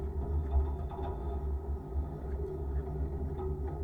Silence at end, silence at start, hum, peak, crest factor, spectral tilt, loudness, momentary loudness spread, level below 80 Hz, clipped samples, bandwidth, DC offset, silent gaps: 0 s; 0 s; none; -20 dBFS; 14 dB; -10.5 dB/octave; -37 LUFS; 5 LU; -36 dBFS; under 0.1%; 3.8 kHz; under 0.1%; none